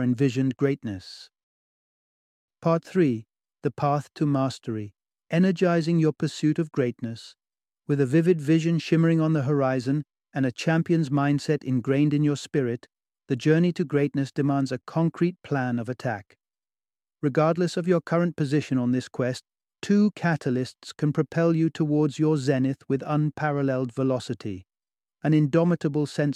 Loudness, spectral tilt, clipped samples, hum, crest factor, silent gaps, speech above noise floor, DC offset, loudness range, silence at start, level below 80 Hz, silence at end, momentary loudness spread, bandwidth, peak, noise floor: -25 LUFS; -7.5 dB/octave; under 0.1%; none; 16 dB; 1.43-2.48 s; over 66 dB; under 0.1%; 4 LU; 0 s; -68 dBFS; 0 s; 11 LU; 10.5 kHz; -8 dBFS; under -90 dBFS